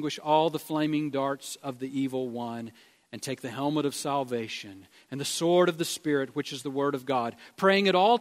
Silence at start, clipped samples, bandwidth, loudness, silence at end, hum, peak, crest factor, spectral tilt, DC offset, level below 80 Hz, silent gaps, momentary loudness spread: 0 s; under 0.1%; 16 kHz; -28 LUFS; 0 s; none; -8 dBFS; 20 dB; -4.5 dB/octave; under 0.1%; -74 dBFS; none; 14 LU